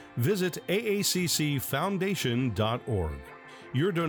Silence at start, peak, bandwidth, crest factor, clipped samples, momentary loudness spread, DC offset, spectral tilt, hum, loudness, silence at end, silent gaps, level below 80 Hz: 0 s; -14 dBFS; 19.5 kHz; 14 dB; under 0.1%; 9 LU; under 0.1%; -4.5 dB/octave; none; -29 LUFS; 0 s; none; -52 dBFS